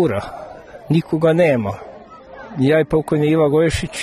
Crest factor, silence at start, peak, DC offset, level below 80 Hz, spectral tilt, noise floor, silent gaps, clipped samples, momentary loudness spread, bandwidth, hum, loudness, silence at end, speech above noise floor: 14 dB; 0 s; -4 dBFS; under 0.1%; -40 dBFS; -7 dB/octave; -39 dBFS; none; under 0.1%; 21 LU; 13 kHz; none; -17 LUFS; 0 s; 22 dB